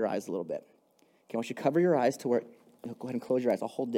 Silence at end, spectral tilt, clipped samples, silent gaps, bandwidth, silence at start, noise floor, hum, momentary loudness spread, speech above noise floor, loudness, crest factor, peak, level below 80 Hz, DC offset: 0 s; -6.5 dB/octave; under 0.1%; none; 16 kHz; 0 s; -67 dBFS; none; 14 LU; 37 dB; -31 LUFS; 18 dB; -14 dBFS; -84 dBFS; under 0.1%